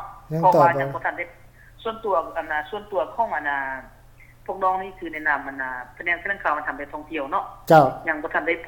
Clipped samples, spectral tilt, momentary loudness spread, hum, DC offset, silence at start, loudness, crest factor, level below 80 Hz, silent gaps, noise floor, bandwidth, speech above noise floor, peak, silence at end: under 0.1%; -6.5 dB/octave; 16 LU; none; under 0.1%; 0 s; -23 LUFS; 20 dB; -52 dBFS; none; -49 dBFS; 18 kHz; 26 dB; -4 dBFS; 0 s